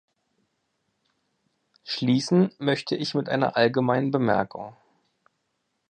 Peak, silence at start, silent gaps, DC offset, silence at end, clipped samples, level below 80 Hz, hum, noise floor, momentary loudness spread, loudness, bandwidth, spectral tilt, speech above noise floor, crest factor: -6 dBFS; 1.85 s; none; under 0.1%; 1.15 s; under 0.1%; -68 dBFS; none; -76 dBFS; 12 LU; -24 LUFS; 9.6 kHz; -6 dB/octave; 53 dB; 20 dB